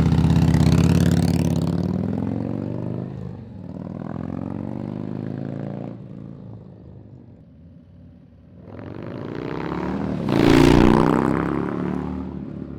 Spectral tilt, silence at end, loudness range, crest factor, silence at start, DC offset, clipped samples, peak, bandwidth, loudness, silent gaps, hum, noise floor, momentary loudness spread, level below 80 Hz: -7.5 dB/octave; 0 s; 18 LU; 16 dB; 0 s; under 0.1%; under 0.1%; -6 dBFS; 15 kHz; -21 LUFS; none; none; -46 dBFS; 21 LU; -36 dBFS